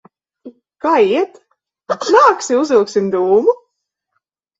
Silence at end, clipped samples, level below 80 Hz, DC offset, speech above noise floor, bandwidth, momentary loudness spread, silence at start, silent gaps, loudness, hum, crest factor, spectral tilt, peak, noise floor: 1.05 s; under 0.1%; -62 dBFS; under 0.1%; 61 dB; 7.8 kHz; 12 LU; 0.45 s; none; -14 LUFS; none; 16 dB; -4.5 dB/octave; 0 dBFS; -74 dBFS